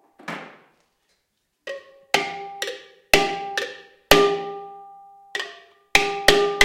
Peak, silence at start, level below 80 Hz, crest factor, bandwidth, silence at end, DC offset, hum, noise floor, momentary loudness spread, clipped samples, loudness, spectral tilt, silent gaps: 0 dBFS; 0.2 s; -46 dBFS; 24 dB; 16.5 kHz; 0 s; under 0.1%; none; -73 dBFS; 21 LU; under 0.1%; -21 LUFS; -2 dB/octave; none